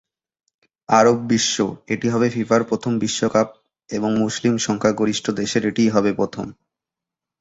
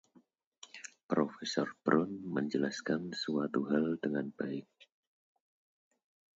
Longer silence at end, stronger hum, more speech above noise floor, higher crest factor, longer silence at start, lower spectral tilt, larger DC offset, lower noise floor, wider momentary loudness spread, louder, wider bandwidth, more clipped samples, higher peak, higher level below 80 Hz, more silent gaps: second, 0.9 s vs 1.75 s; neither; first, 67 dB vs 34 dB; about the same, 18 dB vs 22 dB; first, 0.9 s vs 0.75 s; about the same, -4.5 dB/octave vs -5.5 dB/octave; neither; first, -87 dBFS vs -68 dBFS; second, 8 LU vs 13 LU; first, -20 LUFS vs -35 LUFS; about the same, 8 kHz vs 8 kHz; neither; first, -2 dBFS vs -14 dBFS; first, -56 dBFS vs -78 dBFS; second, none vs 1.03-1.09 s